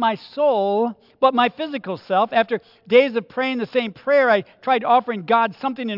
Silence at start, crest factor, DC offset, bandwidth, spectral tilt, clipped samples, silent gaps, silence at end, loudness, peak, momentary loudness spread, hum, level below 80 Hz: 0 s; 18 dB; under 0.1%; 5.8 kHz; -7 dB/octave; under 0.1%; none; 0 s; -20 LUFS; -2 dBFS; 9 LU; none; -74 dBFS